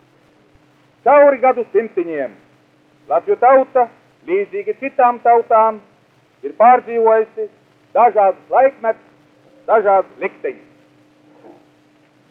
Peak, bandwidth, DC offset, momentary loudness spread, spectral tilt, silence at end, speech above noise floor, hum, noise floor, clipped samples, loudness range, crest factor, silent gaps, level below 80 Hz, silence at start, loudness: -2 dBFS; 3.8 kHz; under 0.1%; 16 LU; -7.5 dB/octave; 1.8 s; 40 dB; none; -54 dBFS; under 0.1%; 4 LU; 16 dB; none; -70 dBFS; 1.05 s; -15 LUFS